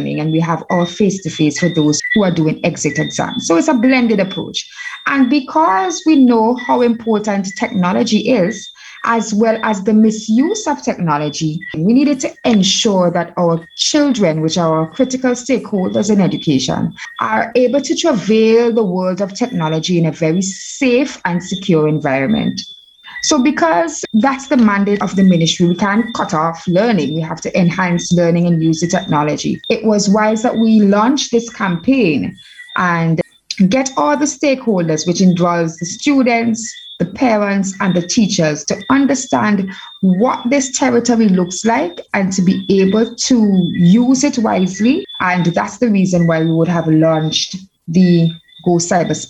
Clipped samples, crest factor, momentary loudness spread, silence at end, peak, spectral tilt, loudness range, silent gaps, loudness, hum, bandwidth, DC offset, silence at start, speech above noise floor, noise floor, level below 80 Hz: under 0.1%; 12 dB; 7 LU; 0.05 s; -2 dBFS; -5 dB/octave; 2 LU; none; -14 LUFS; none; 8.8 kHz; under 0.1%; 0 s; 20 dB; -33 dBFS; -50 dBFS